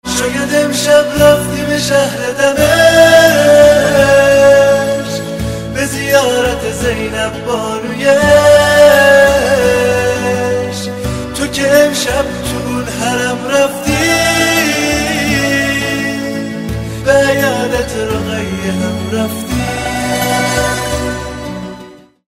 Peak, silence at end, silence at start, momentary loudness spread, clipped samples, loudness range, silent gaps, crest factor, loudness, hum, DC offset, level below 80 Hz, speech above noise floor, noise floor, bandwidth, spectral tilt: 0 dBFS; 0.35 s; 0.05 s; 12 LU; 0.7%; 8 LU; none; 12 dB; -11 LUFS; none; 0.4%; -32 dBFS; 23 dB; -35 dBFS; 16.5 kHz; -4 dB/octave